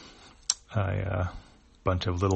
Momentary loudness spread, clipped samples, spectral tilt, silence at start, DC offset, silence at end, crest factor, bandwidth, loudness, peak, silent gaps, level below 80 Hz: 11 LU; under 0.1%; -4.5 dB/octave; 0 s; under 0.1%; 0 s; 26 dB; 8.4 kHz; -31 LUFS; -6 dBFS; none; -46 dBFS